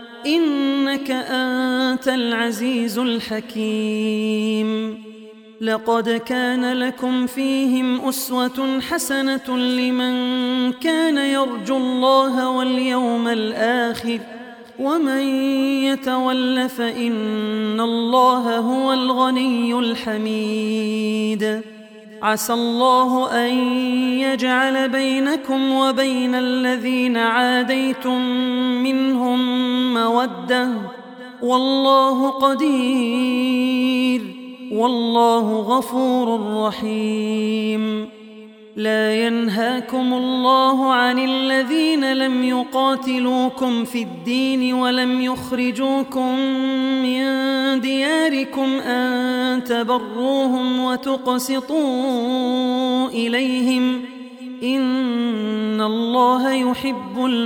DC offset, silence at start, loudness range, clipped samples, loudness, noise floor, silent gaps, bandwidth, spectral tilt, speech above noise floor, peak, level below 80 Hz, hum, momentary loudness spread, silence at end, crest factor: under 0.1%; 0 s; 3 LU; under 0.1%; -19 LUFS; -41 dBFS; none; 17.5 kHz; -4 dB/octave; 22 dB; -4 dBFS; -64 dBFS; none; 6 LU; 0 s; 16 dB